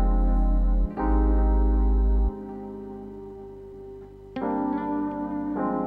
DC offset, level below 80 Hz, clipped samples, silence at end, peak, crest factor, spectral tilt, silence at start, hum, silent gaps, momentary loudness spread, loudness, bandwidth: under 0.1%; -24 dBFS; under 0.1%; 0 s; -12 dBFS; 12 dB; -11 dB/octave; 0 s; 50 Hz at -45 dBFS; none; 18 LU; -26 LUFS; 2.5 kHz